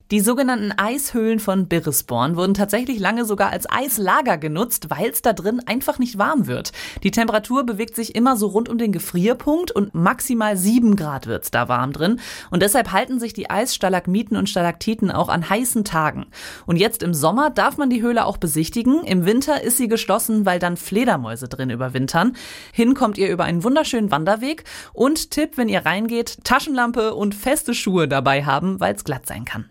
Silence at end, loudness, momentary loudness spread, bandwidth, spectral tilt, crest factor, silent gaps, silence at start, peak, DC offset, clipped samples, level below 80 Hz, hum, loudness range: 0.05 s; -20 LUFS; 6 LU; 17 kHz; -4.5 dB/octave; 18 dB; none; 0.1 s; -2 dBFS; under 0.1%; under 0.1%; -48 dBFS; none; 2 LU